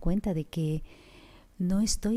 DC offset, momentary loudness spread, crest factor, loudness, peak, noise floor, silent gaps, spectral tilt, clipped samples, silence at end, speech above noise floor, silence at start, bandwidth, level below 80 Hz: under 0.1%; 7 LU; 14 dB; -30 LUFS; -14 dBFS; -54 dBFS; none; -5.5 dB/octave; under 0.1%; 0 s; 25 dB; 0 s; 15.5 kHz; -40 dBFS